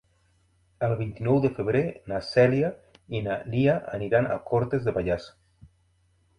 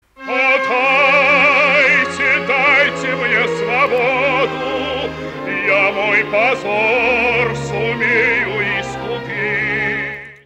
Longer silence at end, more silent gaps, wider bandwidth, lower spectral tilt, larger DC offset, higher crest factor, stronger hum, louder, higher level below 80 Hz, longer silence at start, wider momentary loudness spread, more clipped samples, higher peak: first, 1.1 s vs 0.1 s; neither; second, 10.5 kHz vs 15.5 kHz; first, -8.5 dB/octave vs -4.5 dB/octave; neither; first, 20 dB vs 14 dB; neither; second, -26 LUFS vs -14 LUFS; second, -52 dBFS vs -46 dBFS; first, 0.8 s vs 0.2 s; about the same, 9 LU vs 11 LU; neither; second, -8 dBFS vs -2 dBFS